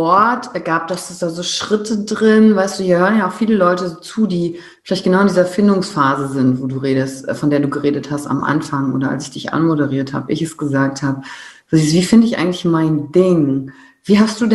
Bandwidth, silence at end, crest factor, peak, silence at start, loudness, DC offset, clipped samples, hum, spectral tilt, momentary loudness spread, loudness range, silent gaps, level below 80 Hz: 12 kHz; 0 s; 14 dB; 0 dBFS; 0 s; -16 LUFS; under 0.1%; under 0.1%; none; -6 dB/octave; 9 LU; 4 LU; none; -54 dBFS